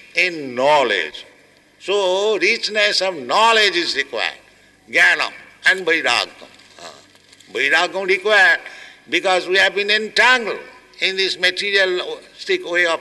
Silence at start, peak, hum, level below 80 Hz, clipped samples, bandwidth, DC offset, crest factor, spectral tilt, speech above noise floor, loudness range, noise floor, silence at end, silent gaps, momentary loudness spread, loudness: 0.15 s; -4 dBFS; none; -66 dBFS; under 0.1%; 12 kHz; under 0.1%; 16 dB; -1.5 dB/octave; 33 dB; 2 LU; -51 dBFS; 0 s; none; 11 LU; -16 LUFS